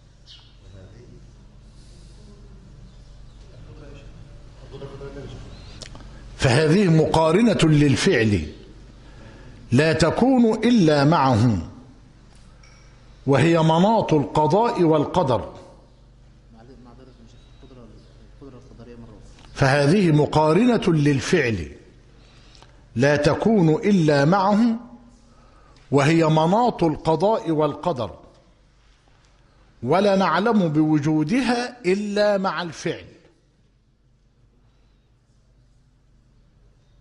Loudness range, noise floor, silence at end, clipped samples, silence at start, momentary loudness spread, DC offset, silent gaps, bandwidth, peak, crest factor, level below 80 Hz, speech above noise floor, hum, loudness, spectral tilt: 8 LU; -60 dBFS; 4 s; under 0.1%; 0.3 s; 18 LU; under 0.1%; none; 11.5 kHz; -6 dBFS; 16 dB; -46 dBFS; 42 dB; none; -19 LUFS; -6.5 dB/octave